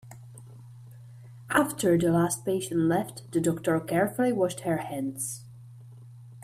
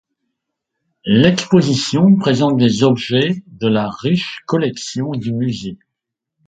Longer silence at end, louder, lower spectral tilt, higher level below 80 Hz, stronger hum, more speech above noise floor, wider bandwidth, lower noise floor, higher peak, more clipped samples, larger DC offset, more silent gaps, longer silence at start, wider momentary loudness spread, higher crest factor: second, 0 s vs 0.7 s; second, -27 LUFS vs -16 LUFS; about the same, -5.5 dB/octave vs -6 dB/octave; second, -62 dBFS vs -52 dBFS; neither; second, 21 dB vs 65 dB; first, 15.5 kHz vs 9.2 kHz; second, -47 dBFS vs -80 dBFS; second, -8 dBFS vs 0 dBFS; neither; neither; neither; second, 0.05 s vs 1.05 s; first, 24 LU vs 10 LU; about the same, 20 dB vs 16 dB